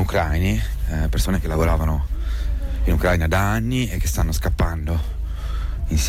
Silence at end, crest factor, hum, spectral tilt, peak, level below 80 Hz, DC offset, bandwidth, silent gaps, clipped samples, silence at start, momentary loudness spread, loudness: 0 s; 12 dB; none; -5.5 dB/octave; -8 dBFS; -22 dBFS; under 0.1%; 16 kHz; none; under 0.1%; 0 s; 8 LU; -22 LUFS